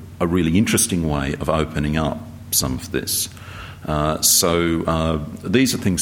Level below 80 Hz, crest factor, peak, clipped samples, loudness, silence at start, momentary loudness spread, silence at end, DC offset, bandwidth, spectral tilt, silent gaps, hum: -36 dBFS; 18 dB; -2 dBFS; under 0.1%; -19 LUFS; 0 s; 11 LU; 0 s; under 0.1%; 18 kHz; -4 dB/octave; none; none